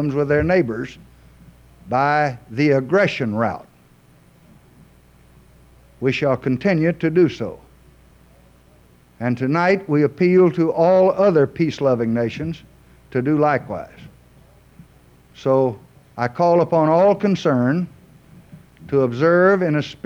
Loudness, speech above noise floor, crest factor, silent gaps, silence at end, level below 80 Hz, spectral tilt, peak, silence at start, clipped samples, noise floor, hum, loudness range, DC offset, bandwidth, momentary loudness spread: -18 LUFS; 34 dB; 14 dB; none; 0.15 s; -50 dBFS; -8 dB/octave; -6 dBFS; 0 s; under 0.1%; -52 dBFS; 60 Hz at -45 dBFS; 7 LU; under 0.1%; 9.2 kHz; 13 LU